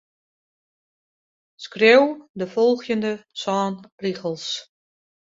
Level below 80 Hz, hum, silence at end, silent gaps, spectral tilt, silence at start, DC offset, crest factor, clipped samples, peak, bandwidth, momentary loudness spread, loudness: -70 dBFS; none; 0.65 s; 2.29-2.34 s, 3.92-3.98 s; -4.5 dB/octave; 1.6 s; under 0.1%; 22 dB; under 0.1%; -2 dBFS; 7.8 kHz; 16 LU; -21 LUFS